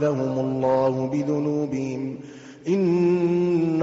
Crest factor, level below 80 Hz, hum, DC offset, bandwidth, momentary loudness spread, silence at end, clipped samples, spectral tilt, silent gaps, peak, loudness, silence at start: 12 dB; -62 dBFS; none; under 0.1%; 7.8 kHz; 12 LU; 0 s; under 0.1%; -8.5 dB/octave; none; -10 dBFS; -23 LUFS; 0 s